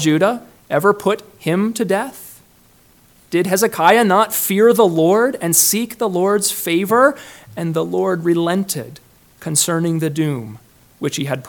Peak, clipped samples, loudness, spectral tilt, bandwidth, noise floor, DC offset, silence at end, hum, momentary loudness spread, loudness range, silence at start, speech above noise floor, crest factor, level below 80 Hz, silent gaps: 0 dBFS; under 0.1%; -16 LUFS; -4 dB/octave; 19 kHz; -51 dBFS; under 0.1%; 0 s; none; 14 LU; 6 LU; 0 s; 35 dB; 18 dB; -60 dBFS; none